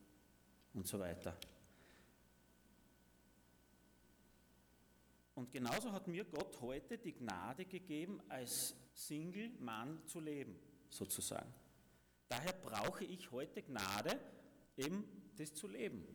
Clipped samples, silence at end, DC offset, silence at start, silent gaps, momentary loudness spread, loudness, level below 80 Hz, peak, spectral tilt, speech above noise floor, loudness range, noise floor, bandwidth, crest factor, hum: under 0.1%; 0 s; under 0.1%; 0 s; none; 14 LU; -47 LUFS; -74 dBFS; -28 dBFS; -3.5 dB/octave; 25 dB; 7 LU; -72 dBFS; over 20 kHz; 20 dB; none